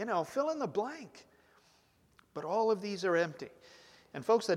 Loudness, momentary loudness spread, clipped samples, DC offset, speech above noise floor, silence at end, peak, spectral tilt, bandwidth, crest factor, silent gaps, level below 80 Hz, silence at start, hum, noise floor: -34 LUFS; 17 LU; under 0.1%; under 0.1%; 35 dB; 0 s; -16 dBFS; -5 dB/octave; 14.5 kHz; 18 dB; none; -80 dBFS; 0 s; none; -68 dBFS